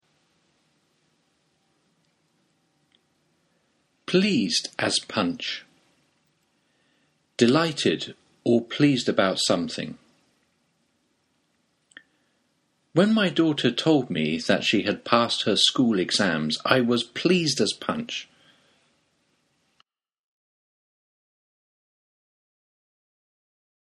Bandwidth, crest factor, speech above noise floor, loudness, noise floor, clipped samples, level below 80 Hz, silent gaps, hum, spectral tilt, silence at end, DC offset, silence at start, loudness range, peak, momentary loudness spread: 12.5 kHz; 26 dB; 48 dB; -23 LUFS; -71 dBFS; under 0.1%; -68 dBFS; none; none; -4 dB/octave; 5.6 s; under 0.1%; 4.1 s; 9 LU; 0 dBFS; 11 LU